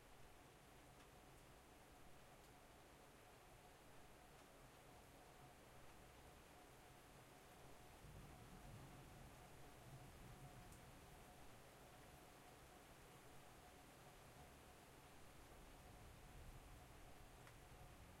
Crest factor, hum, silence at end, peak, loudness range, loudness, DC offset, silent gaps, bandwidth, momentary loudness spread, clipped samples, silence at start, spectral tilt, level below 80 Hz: 16 dB; none; 0 s; -48 dBFS; 3 LU; -64 LUFS; under 0.1%; none; 16 kHz; 4 LU; under 0.1%; 0 s; -4 dB/octave; -70 dBFS